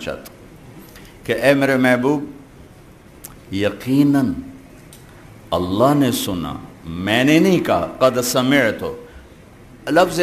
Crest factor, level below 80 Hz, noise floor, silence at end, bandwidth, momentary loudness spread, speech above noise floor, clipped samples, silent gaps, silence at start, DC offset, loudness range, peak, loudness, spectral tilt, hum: 18 dB; -48 dBFS; -44 dBFS; 0 s; 15 kHz; 19 LU; 27 dB; under 0.1%; none; 0 s; under 0.1%; 5 LU; 0 dBFS; -17 LUFS; -5 dB/octave; none